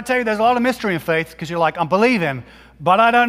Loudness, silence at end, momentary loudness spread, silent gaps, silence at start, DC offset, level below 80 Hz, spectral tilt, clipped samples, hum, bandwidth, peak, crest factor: -18 LUFS; 0 s; 9 LU; none; 0 s; under 0.1%; -52 dBFS; -5.5 dB/octave; under 0.1%; none; 16 kHz; -2 dBFS; 16 dB